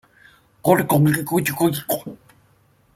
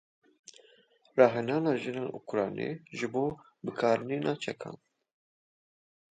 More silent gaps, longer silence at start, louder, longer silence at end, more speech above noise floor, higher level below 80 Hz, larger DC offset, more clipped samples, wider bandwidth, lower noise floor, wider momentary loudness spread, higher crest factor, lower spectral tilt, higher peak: neither; second, 0.65 s vs 1.15 s; first, -20 LUFS vs -31 LUFS; second, 0.8 s vs 1.35 s; first, 39 dB vs 34 dB; first, -56 dBFS vs -74 dBFS; neither; neither; first, 16.5 kHz vs 9.2 kHz; second, -58 dBFS vs -64 dBFS; second, 10 LU vs 14 LU; about the same, 20 dB vs 24 dB; about the same, -6 dB/octave vs -6.5 dB/octave; first, -2 dBFS vs -8 dBFS